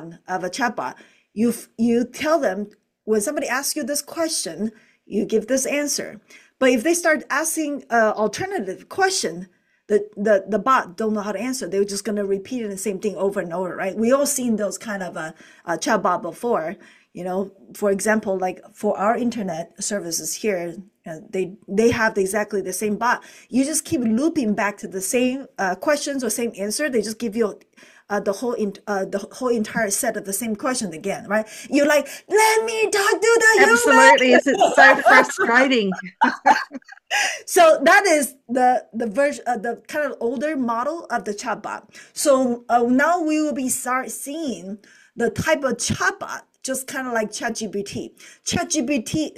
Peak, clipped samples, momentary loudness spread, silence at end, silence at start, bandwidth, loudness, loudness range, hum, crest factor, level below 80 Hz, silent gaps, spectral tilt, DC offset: 0 dBFS; under 0.1%; 13 LU; 0.1 s; 0 s; 16 kHz; -20 LUFS; 10 LU; none; 20 dB; -60 dBFS; none; -3 dB/octave; under 0.1%